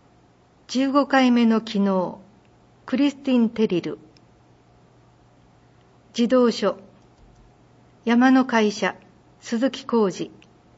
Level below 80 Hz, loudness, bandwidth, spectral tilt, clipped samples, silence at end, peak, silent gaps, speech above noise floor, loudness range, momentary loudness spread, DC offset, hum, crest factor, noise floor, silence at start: -64 dBFS; -21 LUFS; 8 kHz; -5.5 dB/octave; under 0.1%; 0.5 s; -4 dBFS; none; 36 dB; 5 LU; 16 LU; under 0.1%; none; 18 dB; -56 dBFS; 0.7 s